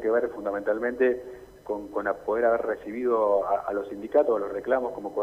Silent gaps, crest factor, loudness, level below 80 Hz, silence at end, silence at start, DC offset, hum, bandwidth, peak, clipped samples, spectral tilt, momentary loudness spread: none; 18 dB; -27 LUFS; -60 dBFS; 0 s; 0 s; under 0.1%; none; 15 kHz; -10 dBFS; under 0.1%; -7 dB/octave; 9 LU